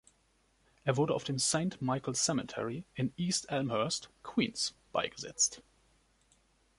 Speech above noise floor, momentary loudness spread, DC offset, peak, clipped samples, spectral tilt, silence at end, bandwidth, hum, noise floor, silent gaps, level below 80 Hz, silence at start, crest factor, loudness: 38 dB; 8 LU; under 0.1%; -16 dBFS; under 0.1%; -3.5 dB/octave; 1.2 s; 11.5 kHz; none; -71 dBFS; none; -68 dBFS; 0.85 s; 20 dB; -33 LUFS